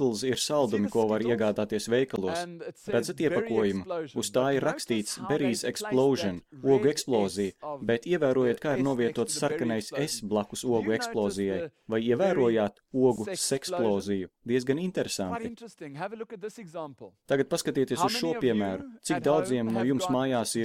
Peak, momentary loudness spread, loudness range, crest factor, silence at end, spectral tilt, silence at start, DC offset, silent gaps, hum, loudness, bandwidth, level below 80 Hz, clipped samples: -10 dBFS; 9 LU; 4 LU; 16 dB; 0 s; -5 dB/octave; 0 s; under 0.1%; none; none; -28 LUFS; 16 kHz; -64 dBFS; under 0.1%